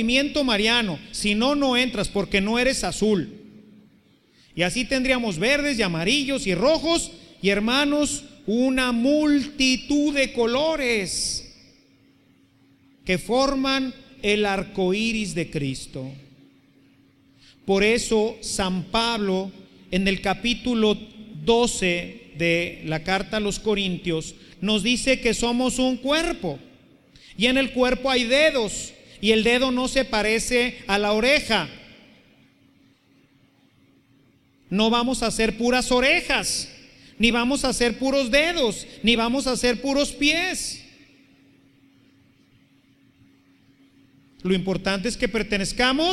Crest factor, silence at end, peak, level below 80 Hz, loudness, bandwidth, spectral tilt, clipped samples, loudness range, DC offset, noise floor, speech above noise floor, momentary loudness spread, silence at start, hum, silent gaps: 20 dB; 0 s; -4 dBFS; -44 dBFS; -22 LUFS; 13.5 kHz; -3.5 dB/octave; under 0.1%; 6 LU; under 0.1%; -59 dBFS; 37 dB; 9 LU; 0 s; none; none